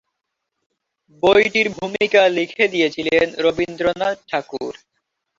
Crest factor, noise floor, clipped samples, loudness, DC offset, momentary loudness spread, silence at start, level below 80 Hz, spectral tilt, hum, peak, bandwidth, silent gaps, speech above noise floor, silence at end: 18 dB; -78 dBFS; under 0.1%; -18 LUFS; under 0.1%; 11 LU; 1.25 s; -54 dBFS; -4.5 dB/octave; none; -2 dBFS; 7.8 kHz; none; 60 dB; 0.65 s